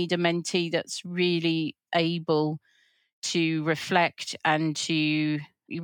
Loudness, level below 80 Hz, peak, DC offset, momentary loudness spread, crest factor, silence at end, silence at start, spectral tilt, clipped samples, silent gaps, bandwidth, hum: -26 LUFS; -84 dBFS; -8 dBFS; under 0.1%; 7 LU; 20 dB; 0 s; 0 s; -4.5 dB/octave; under 0.1%; 3.13-3.22 s; 17.5 kHz; none